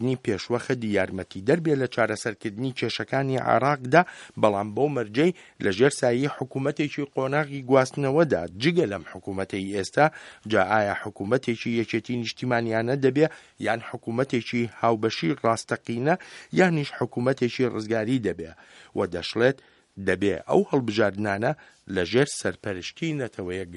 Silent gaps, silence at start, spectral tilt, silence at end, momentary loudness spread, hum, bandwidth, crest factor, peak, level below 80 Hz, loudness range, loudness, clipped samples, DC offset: none; 0 s; -6 dB/octave; 0 s; 9 LU; none; 11.5 kHz; 24 dB; -2 dBFS; -62 dBFS; 2 LU; -25 LUFS; under 0.1%; under 0.1%